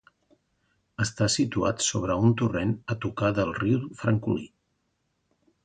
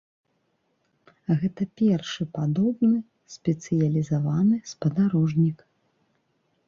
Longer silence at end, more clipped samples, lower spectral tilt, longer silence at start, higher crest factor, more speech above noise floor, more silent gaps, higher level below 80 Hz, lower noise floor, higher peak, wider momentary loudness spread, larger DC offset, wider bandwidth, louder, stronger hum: about the same, 1.15 s vs 1.15 s; neither; second, -5 dB/octave vs -7.5 dB/octave; second, 1 s vs 1.3 s; about the same, 18 dB vs 14 dB; about the same, 49 dB vs 48 dB; neither; first, -52 dBFS vs -62 dBFS; about the same, -75 dBFS vs -72 dBFS; about the same, -10 dBFS vs -10 dBFS; about the same, 8 LU vs 8 LU; neither; first, 9.6 kHz vs 7.4 kHz; about the same, -26 LUFS vs -25 LUFS; neither